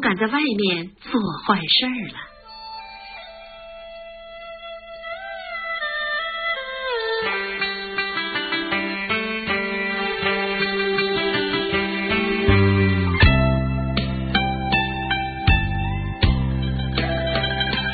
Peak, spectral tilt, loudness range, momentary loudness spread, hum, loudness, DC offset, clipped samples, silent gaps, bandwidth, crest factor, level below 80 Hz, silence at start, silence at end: -2 dBFS; -10.5 dB/octave; 10 LU; 19 LU; none; -21 LUFS; under 0.1%; under 0.1%; none; 4.9 kHz; 20 dB; -32 dBFS; 0 s; 0 s